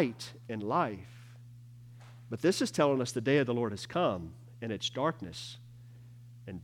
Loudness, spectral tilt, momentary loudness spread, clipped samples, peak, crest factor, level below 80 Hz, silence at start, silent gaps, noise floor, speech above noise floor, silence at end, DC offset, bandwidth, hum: -32 LUFS; -5 dB/octave; 24 LU; under 0.1%; -14 dBFS; 20 dB; -70 dBFS; 0 s; none; -52 dBFS; 20 dB; 0 s; under 0.1%; 17 kHz; 60 Hz at -50 dBFS